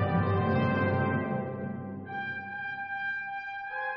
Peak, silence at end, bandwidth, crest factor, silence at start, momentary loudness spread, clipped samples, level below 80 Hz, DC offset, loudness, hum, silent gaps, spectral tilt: -16 dBFS; 0 s; 5.6 kHz; 14 dB; 0 s; 10 LU; under 0.1%; -60 dBFS; under 0.1%; -31 LUFS; none; none; -6 dB/octave